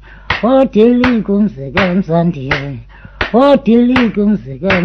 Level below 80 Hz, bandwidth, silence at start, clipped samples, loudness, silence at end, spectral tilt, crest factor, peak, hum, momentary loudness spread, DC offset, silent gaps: -36 dBFS; 6.4 kHz; 0.1 s; 0.3%; -12 LUFS; 0 s; -8 dB/octave; 12 dB; 0 dBFS; none; 9 LU; under 0.1%; none